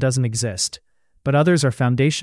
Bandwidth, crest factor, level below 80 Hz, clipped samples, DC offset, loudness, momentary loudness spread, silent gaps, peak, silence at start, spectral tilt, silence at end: 12 kHz; 14 dB; -54 dBFS; under 0.1%; under 0.1%; -20 LUFS; 9 LU; none; -6 dBFS; 0 s; -5 dB/octave; 0 s